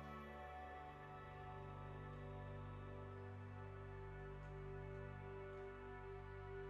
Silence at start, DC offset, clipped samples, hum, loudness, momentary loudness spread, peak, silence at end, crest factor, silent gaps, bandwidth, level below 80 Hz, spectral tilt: 0 s; under 0.1%; under 0.1%; 50 Hz at -65 dBFS; -54 LUFS; 2 LU; -42 dBFS; 0 s; 12 dB; none; 7.8 kHz; -62 dBFS; -8 dB/octave